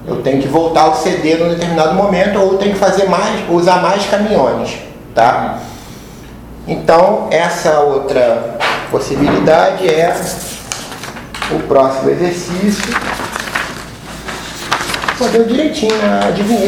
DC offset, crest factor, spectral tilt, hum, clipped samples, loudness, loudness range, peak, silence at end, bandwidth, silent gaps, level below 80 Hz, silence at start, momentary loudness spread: under 0.1%; 14 dB; -5 dB/octave; none; 0.1%; -13 LUFS; 4 LU; 0 dBFS; 0 s; 19 kHz; none; -38 dBFS; 0 s; 14 LU